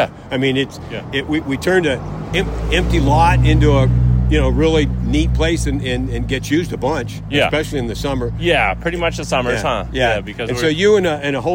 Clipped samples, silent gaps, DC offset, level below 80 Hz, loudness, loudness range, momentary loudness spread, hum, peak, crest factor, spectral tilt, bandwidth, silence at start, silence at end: under 0.1%; none; under 0.1%; -24 dBFS; -17 LUFS; 4 LU; 8 LU; none; -2 dBFS; 14 dB; -6 dB/octave; 16.5 kHz; 0 s; 0 s